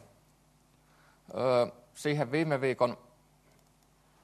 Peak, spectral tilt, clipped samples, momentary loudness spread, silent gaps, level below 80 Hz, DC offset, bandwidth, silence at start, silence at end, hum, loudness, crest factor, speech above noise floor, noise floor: -12 dBFS; -6 dB/octave; under 0.1%; 9 LU; none; -72 dBFS; under 0.1%; 13 kHz; 1.3 s; 1.3 s; none; -31 LUFS; 22 dB; 36 dB; -65 dBFS